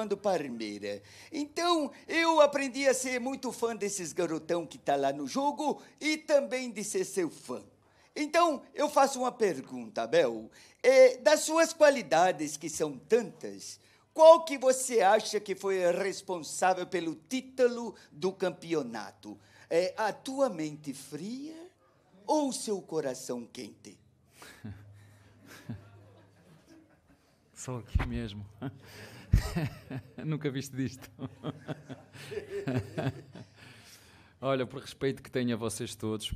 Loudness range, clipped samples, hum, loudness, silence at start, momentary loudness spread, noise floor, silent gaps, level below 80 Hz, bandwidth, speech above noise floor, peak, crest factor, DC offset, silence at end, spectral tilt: 14 LU; under 0.1%; none; -30 LUFS; 0 s; 19 LU; -65 dBFS; none; -48 dBFS; 15 kHz; 35 dB; -6 dBFS; 24 dB; under 0.1%; 0 s; -4.5 dB/octave